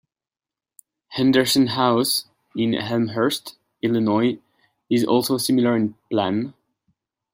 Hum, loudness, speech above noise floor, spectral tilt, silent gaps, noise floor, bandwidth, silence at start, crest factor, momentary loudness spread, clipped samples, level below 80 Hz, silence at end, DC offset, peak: none; -21 LUFS; over 70 dB; -4.5 dB/octave; none; under -90 dBFS; 16 kHz; 1.1 s; 18 dB; 11 LU; under 0.1%; -64 dBFS; 0.8 s; under 0.1%; -4 dBFS